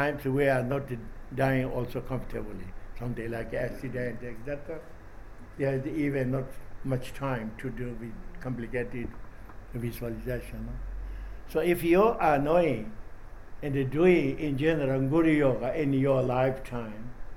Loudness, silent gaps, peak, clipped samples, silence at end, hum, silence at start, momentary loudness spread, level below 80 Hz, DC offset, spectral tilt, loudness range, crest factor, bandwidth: -29 LUFS; none; -10 dBFS; under 0.1%; 0 s; none; 0 s; 18 LU; -42 dBFS; under 0.1%; -8 dB/octave; 11 LU; 20 dB; 17.5 kHz